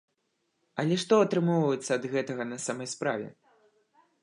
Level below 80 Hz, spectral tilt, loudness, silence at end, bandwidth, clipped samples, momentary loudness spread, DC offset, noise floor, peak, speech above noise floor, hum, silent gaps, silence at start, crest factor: -80 dBFS; -5.5 dB/octave; -28 LUFS; 0.9 s; 11 kHz; under 0.1%; 11 LU; under 0.1%; -77 dBFS; -10 dBFS; 49 dB; none; none; 0.75 s; 20 dB